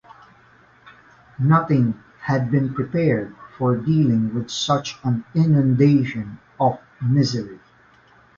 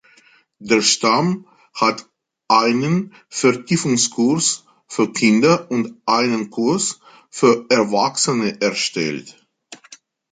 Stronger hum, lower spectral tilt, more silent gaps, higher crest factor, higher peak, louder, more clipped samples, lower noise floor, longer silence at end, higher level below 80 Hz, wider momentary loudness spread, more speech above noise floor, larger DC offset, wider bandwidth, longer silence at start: neither; first, -7 dB/octave vs -3.5 dB/octave; neither; about the same, 18 dB vs 18 dB; about the same, -4 dBFS vs -2 dBFS; about the same, -20 LUFS vs -18 LUFS; neither; about the same, -53 dBFS vs -53 dBFS; first, 0.8 s vs 0.35 s; first, -54 dBFS vs -64 dBFS; second, 10 LU vs 13 LU; about the same, 34 dB vs 36 dB; neither; second, 7.4 kHz vs 9.6 kHz; first, 0.85 s vs 0.6 s